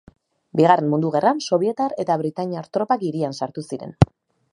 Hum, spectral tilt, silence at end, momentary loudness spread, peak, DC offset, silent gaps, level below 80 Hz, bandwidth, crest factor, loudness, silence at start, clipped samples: none; -7 dB/octave; 0.45 s; 12 LU; 0 dBFS; under 0.1%; none; -44 dBFS; 11 kHz; 20 dB; -21 LUFS; 0.55 s; under 0.1%